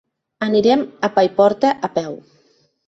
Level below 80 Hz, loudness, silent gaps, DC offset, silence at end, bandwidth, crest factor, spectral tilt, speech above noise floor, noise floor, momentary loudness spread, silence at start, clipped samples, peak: -62 dBFS; -17 LUFS; none; under 0.1%; 0.7 s; 8 kHz; 16 dB; -6 dB/octave; 42 dB; -59 dBFS; 11 LU; 0.4 s; under 0.1%; -2 dBFS